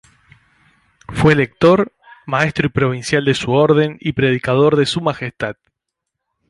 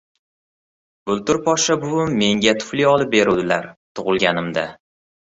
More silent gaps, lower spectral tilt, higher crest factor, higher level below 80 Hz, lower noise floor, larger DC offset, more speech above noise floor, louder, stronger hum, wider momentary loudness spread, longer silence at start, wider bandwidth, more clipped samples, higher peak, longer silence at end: second, none vs 3.77-3.95 s; first, -6 dB/octave vs -4 dB/octave; about the same, 16 dB vs 18 dB; first, -44 dBFS vs -54 dBFS; second, -79 dBFS vs under -90 dBFS; neither; second, 64 dB vs over 72 dB; about the same, -16 LUFS vs -18 LUFS; neither; about the same, 11 LU vs 9 LU; about the same, 1.1 s vs 1.05 s; first, 11.5 kHz vs 8.2 kHz; neither; about the same, -2 dBFS vs -2 dBFS; first, 0.95 s vs 0.65 s